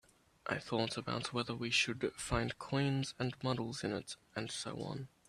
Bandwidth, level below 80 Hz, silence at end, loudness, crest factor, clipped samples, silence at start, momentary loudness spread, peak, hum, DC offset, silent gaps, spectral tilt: 13.5 kHz; -60 dBFS; 0.2 s; -38 LUFS; 20 dB; under 0.1%; 0.45 s; 10 LU; -18 dBFS; none; under 0.1%; none; -4.5 dB/octave